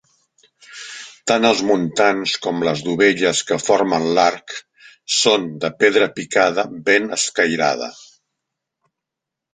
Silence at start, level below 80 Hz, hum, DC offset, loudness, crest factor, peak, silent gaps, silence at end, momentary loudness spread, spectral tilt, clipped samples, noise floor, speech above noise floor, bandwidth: 0.7 s; -62 dBFS; none; under 0.1%; -17 LUFS; 18 dB; 0 dBFS; none; 1.6 s; 16 LU; -3 dB/octave; under 0.1%; -84 dBFS; 66 dB; 9.6 kHz